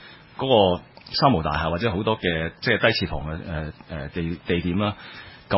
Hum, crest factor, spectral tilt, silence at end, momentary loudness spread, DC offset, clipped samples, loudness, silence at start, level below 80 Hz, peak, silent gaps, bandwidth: none; 20 dB; -9.5 dB/octave; 0 s; 15 LU; under 0.1%; under 0.1%; -23 LUFS; 0 s; -40 dBFS; -4 dBFS; none; 5.8 kHz